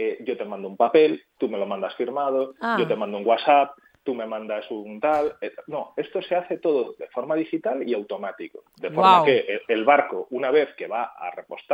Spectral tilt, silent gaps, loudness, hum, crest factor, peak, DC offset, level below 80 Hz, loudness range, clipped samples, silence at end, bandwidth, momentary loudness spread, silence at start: -6.5 dB/octave; none; -23 LUFS; none; 20 dB; -2 dBFS; under 0.1%; -72 dBFS; 6 LU; under 0.1%; 0 s; 8 kHz; 15 LU; 0 s